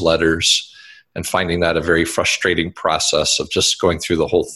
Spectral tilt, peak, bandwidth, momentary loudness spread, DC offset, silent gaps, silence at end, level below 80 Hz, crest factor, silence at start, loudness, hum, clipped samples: -3 dB/octave; -2 dBFS; 13.5 kHz; 5 LU; under 0.1%; none; 0 s; -38 dBFS; 16 dB; 0 s; -16 LUFS; none; under 0.1%